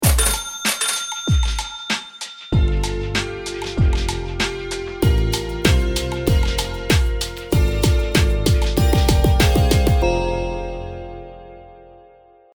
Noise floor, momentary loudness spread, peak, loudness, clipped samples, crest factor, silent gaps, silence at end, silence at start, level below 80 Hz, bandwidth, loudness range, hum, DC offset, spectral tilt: -49 dBFS; 11 LU; 0 dBFS; -20 LUFS; under 0.1%; 18 dB; none; 0.65 s; 0 s; -22 dBFS; over 20 kHz; 4 LU; none; under 0.1%; -4.5 dB/octave